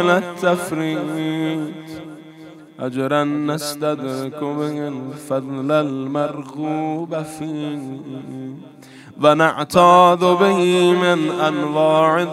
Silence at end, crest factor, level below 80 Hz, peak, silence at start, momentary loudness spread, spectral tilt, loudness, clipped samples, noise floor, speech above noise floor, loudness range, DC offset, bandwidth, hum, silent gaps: 0 s; 18 dB; -62 dBFS; 0 dBFS; 0 s; 17 LU; -5.5 dB/octave; -18 LUFS; under 0.1%; -40 dBFS; 22 dB; 9 LU; under 0.1%; 15.5 kHz; none; none